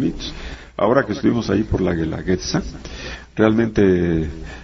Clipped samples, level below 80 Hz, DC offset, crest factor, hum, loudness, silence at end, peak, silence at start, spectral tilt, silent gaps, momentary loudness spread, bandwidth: under 0.1%; -36 dBFS; under 0.1%; 18 dB; none; -19 LUFS; 0 s; -2 dBFS; 0 s; -6.5 dB/octave; none; 16 LU; 7.6 kHz